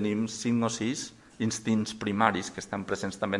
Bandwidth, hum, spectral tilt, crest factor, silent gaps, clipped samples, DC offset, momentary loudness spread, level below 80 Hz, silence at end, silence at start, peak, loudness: 11.5 kHz; none; -4.5 dB/octave; 24 dB; none; under 0.1%; under 0.1%; 9 LU; -64 dBFS; 0 s; 0 s; -6 dBFS; -30 LUFS